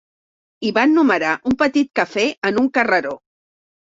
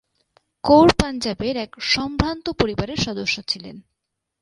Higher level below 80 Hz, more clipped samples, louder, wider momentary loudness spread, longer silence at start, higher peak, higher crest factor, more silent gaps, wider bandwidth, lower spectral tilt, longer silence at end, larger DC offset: second, -56 dBFS vs -38 dBFS; neither; first, -17 LUFS vs -20 LUFS; second, 7 LU vs 13 LU; about the same, 0.6 s vs 0.65 s; about the same, -2 dBFS vs 0 dBFS; about the same, 18 dB vs 22 dB; first, 2.38-2.42 s vs none; second, 7.8 kHz vs 11.5 kHz; about the same, -4.5 dB/octave vs -5 dB/octave; first, 0.8 s vs 0.6 s; neither